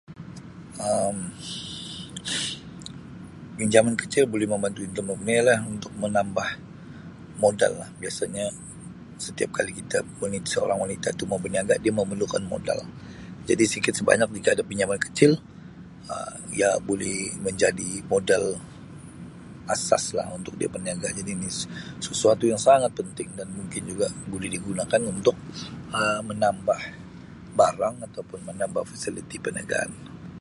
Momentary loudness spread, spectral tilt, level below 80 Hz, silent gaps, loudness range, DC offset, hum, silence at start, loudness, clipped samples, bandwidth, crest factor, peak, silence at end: 20 LU; -4 dB/octave; -54 dBFS; none; 5 LU; under 0.1%; none; 0.1 s; -25 LUFS; under 0.1%; 11.5 kHz; 26 dB; 0 dBFS; 0 s